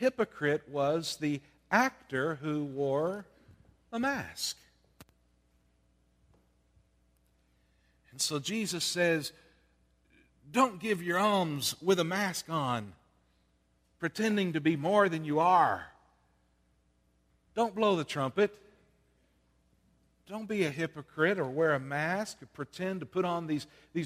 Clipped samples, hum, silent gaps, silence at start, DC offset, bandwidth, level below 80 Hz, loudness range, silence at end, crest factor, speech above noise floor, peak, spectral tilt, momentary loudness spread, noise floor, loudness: under 0.1%; none; none; 0 s; under 0.1%; 15.5 kHz; -70 dBFS; 8 LU; 0 s; 22 dB; 41 dB; -10 dBFS; -4.5 dB/octave; 11 LU; -71 dBFS; -31 LUFS